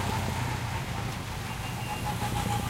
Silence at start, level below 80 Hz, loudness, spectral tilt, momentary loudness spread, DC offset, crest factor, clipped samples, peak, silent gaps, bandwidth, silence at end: 0 s; -42 dBFS; -32 LUFS; -4.5 dB/octave; 4 LU; under 0.1%; 14 dB; under 0.1%; -16 dBFS; none; 16 kHz; 0 s